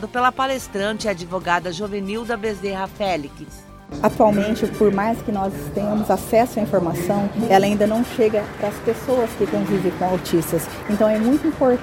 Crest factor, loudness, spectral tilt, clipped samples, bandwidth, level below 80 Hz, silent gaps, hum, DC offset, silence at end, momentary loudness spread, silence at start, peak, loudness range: 18 dB; -20 LUFS; -6 dB/octave; under 0.1%; 17 kHz; -44 dBFS; none; none; under 0.1%; 0 s; 9 LU; 0 s; -2 dBFS; 4 LU